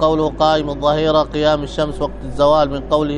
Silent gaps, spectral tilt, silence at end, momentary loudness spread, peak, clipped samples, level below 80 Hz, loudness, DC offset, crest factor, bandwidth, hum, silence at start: none; -6.5 dB/octave; 0 s; 7 LU; 0 dBFS; under 0.1%; -32 dBFS; -17 LUFS; under 0.1%; 16 dB; 10 kHz; none; 0 s